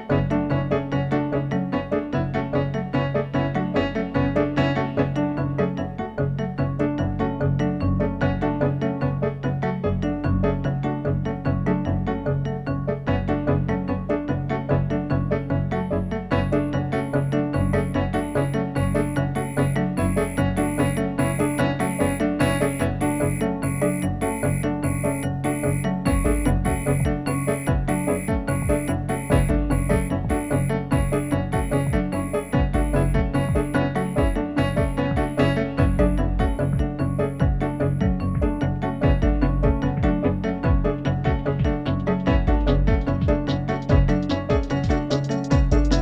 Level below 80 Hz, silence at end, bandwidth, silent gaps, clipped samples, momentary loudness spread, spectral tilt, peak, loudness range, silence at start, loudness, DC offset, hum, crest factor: -30 dBFS; 0 s; 13 kHz; none; under 0.1%; 4 LU; -7 dB/octave; -6 dBFS; 2 LU; 0 s; -23 LUFS; under 0.1%; none; 16 dB